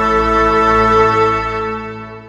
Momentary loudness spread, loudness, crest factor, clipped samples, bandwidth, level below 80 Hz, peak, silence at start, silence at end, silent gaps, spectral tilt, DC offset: 12 LU; -13 LUFS; 14 dB; under 0.1%; 9.8 kHz; -30 dBFS; 0 dBFS; 0 s; 0 s; none; -6 dB/octave; under 0.1%